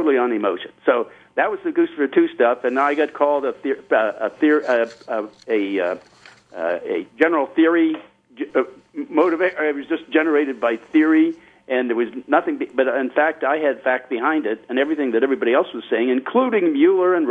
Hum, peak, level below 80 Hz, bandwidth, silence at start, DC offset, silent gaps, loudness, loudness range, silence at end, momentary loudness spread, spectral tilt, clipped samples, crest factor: none; -2 dBFS; -72 dBFS; 6.4 kHz; 0 s; under 0.1%; none; -20 LUFS; 2 LU; 0 s; 8 LU; -6 dB/octave; under 0.1%; 18 dB